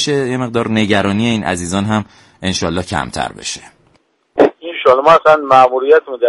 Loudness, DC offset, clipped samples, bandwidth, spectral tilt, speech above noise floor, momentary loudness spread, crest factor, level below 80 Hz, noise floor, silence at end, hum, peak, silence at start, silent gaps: -14 LUFS; under 0.1%; 0.1%; 11.5 kHz; -5 dB/octave; 43 dB; 14 LU; 14 dB; -44 dBFS; -56 dBFS; 0 s; none; 0 dBFS; 0 s; none